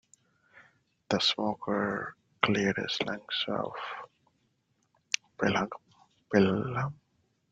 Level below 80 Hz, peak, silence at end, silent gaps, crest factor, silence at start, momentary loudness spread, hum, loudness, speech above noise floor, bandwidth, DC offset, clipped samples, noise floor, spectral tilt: -68 dBFS; -2 dBFS; 0.55 s; none; 30 dB; 0.55 s; 11 LU; none; -30 LUFS; 44 dB; 8 kHz; under 0.1%; under 0.1%; -74 dBFS; -4.5 dB/octave